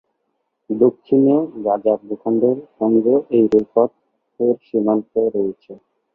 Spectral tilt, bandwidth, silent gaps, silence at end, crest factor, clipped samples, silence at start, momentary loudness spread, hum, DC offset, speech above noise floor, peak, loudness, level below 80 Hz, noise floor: -11 dB/octave; 4.7 kHz; none; 0.4 s; 16 dB; under 0.1%; 0.7 s; 7 LU; none; under 0.1%; 55 dB; -2 dBFS; -18 LUFS; -62 dBFS; -72 dBFS